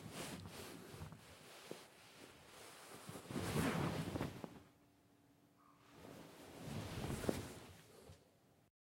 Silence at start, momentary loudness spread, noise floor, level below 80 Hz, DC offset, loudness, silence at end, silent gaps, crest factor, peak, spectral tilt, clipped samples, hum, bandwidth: 0 s; 20 LU; -72 dBFS; -66 dBFS; under 0.1%; -47 LUFS; 0.55 s; none; 28 dB; -20 dBFS; -5 dB/octave; under 0.1%; none; 16.5 kHz